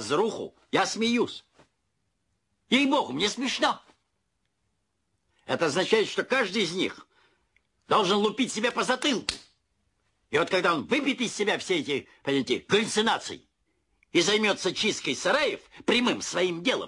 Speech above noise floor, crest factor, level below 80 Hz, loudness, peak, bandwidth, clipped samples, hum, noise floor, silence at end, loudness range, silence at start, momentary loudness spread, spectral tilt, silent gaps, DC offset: 51 dB; 18 dB; -66 dBFS; -26 LUFS; -10 dBFS; 11.5 kHz; under 0.1%; none; -77 dBFS; 0 s; 3 LU; 0 s; 8 LU; -3 dB/octave; none; under 0.1%